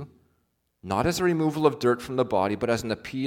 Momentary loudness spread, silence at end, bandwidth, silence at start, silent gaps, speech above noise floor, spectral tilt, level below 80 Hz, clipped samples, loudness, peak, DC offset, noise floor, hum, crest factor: 8 LU; 0 s; 17.5 kHz; 0 s; none; 48 dB; -5.5 dB/octave; -54 dBFS; under 0.1%; -25 LUFS; -6 dBFS; under 0.1%; -73 dBFS; none; 20 dB